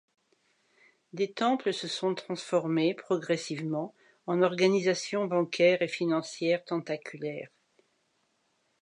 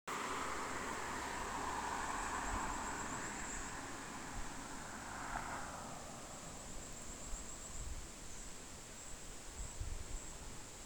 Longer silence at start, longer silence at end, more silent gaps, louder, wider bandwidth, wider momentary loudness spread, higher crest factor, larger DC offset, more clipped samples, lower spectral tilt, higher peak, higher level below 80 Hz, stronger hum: first, 1.15 s vs 0.05 s; first, 1.35 s vs 0 s; neither; first, -29 LUFS vs -45 LUFS; second, 10.5 kHz vs over 20 kHz; first, 13 LU vs 9 LU; about the same, 20 dB vs 18 dB; neither; neither; first, -5 dB/octave vs -2.5 dB/octave; first, -10 dBFS vs -28 dBFS; second, -84 dBFS vs -52 dBFS; neither